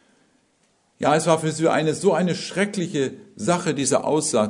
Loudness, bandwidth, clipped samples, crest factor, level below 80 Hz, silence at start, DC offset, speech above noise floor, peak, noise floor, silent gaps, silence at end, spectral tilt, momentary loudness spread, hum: -22 LUFS; 11 kHz; under 0.1%; 20 dB; -64 dBFS; 1 s; under 0.1%; 43 dB; -2 dBFS; -64 dBFS; none; 0 s; -4.5 dB/octave; 6 LU; none